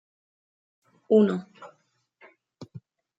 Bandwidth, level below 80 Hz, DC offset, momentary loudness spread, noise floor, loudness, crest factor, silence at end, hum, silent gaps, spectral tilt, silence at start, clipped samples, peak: 7.8 kHz; -78 dBFS; under 0.1%; 25 LU; -69 dBFS; -23 LUFS; 20 dB; 0.4 s; none; none; -8.5 dB/octave; 1.1 s; under 0.1%; -8 dBFS